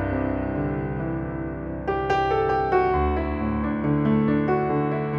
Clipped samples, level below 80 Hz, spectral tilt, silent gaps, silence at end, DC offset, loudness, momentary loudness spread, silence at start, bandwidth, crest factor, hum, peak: under 0.1%; -36 dBFS; -9 dB/octave; none; 0 s; under 0.1%; -24 LUFS; 8 LU; 0 s; 7 kHz; 14 dB; none; -10 dBFS